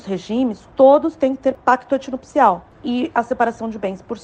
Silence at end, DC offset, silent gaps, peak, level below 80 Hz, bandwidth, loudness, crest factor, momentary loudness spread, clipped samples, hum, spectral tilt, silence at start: 0.05 s; under 0.1%; none; 0 dBFS; -54 dBFS; 8.6 kHz; -18 LUFS; 18 dB; 13 LU; under 0.1%; none; -6 dB/octave; 0.05 s